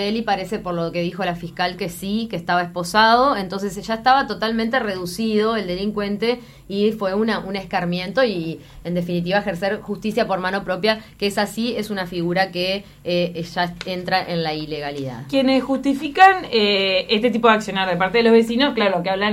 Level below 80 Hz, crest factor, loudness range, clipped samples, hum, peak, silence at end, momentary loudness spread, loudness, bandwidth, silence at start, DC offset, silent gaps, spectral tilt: -50 dBFS; 18 dB; 6 LU; under 0.1%; none; -2 dBFS; 0 s; 10 LU; -20 LUFS; 16 kHz; 0 s; under 0.1%; none; -5 dB/octave